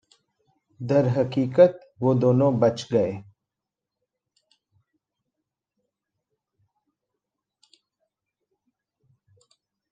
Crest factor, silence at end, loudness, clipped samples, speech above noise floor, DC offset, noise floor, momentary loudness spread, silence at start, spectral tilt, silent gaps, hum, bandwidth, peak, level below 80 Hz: 24 dB; 6.7 s; -22 LUFS; under 0.1%; 66 dB; under 0.1%; -87 dBFS; 9 LU; 0.8 s; -8 dB/octave; none; none; 7.8 kHz; -4 dBFS; -68 dBFS